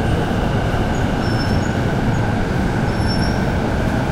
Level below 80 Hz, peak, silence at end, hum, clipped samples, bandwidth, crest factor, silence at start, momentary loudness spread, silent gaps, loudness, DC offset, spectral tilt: -26 dBFS; -4 dBFS; 0 s; none; under 0.1%; 15.5 kHz; 12 dB; 0 s; 1 LU; none; -19 LUFS; under 0.1%; -6.5 dB/octave